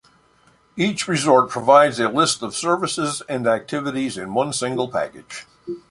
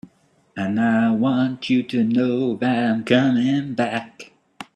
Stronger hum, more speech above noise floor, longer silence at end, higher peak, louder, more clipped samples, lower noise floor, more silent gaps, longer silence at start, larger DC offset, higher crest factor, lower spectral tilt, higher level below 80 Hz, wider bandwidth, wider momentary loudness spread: neither; about the same, 37 dB vs 40 dB; about the same, 0.1 s vs 0.15 s; about the same, -2 dBFS vs -2 dBFS; about the same, -20 LUFS vs -20 LUFS; neither; about the same, -57 dBFS vs -59 dBFS; neither; first, 0.75 s vs 0.05 s; neither; about the same, 18 dB vs 20 dB; second, -4 dB/octave vs -7 dB/octave; about the same, -60 dBFS vs -62 dBFS; first, 11.5 kHz vs 8.8 kHz; first, 19 LU vs 11 LU